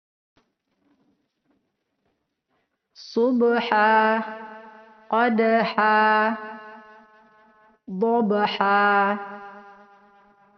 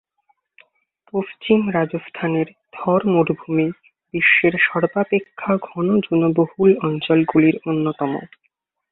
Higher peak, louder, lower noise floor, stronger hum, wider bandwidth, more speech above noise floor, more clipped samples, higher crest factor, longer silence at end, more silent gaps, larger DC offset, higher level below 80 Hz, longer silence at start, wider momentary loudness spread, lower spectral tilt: about the same, -4 dBFS vs -2 dBFS; about the same, -21 LUFS vs -19 LUFS; first, -74 dBFS vs -66 dBFS; neither; first, 6.4 kHz vs 4.1 kHz; first, 54 dB vs 48 dB; neither; about the same, 20 dB vs 18 dB; first, 0.95 s vs 0.65 s; neither; neither; second, -74 dBFS vs -60 dBFS; first, 3 s vs 1.15 s; first, 20 LU vs 11 LU; second, -3 dB/octave vs -11.5 dB/octave